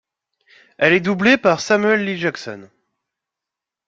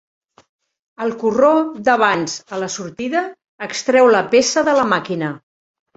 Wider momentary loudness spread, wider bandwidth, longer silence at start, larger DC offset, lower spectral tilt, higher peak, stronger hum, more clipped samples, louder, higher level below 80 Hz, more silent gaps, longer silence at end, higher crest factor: first, 17 LU vs 13 LU; about the same, 7.8 kHz vs 8 kHz; second, 0.8 s vs 1 s; neither; first, -5 dB/octave vs -3.5 dB/octave; about the same, -2 dBFS vs -2 dBFS; neither; neither; about the same, -16 LUFS vs -17 LUFS; about the same, -60 dBFS vs -60 dBFS; second, none vs 3.48-3.59 s; first, 1.2 s vs 0.6 s; about the same, 18 dB vs 16 dB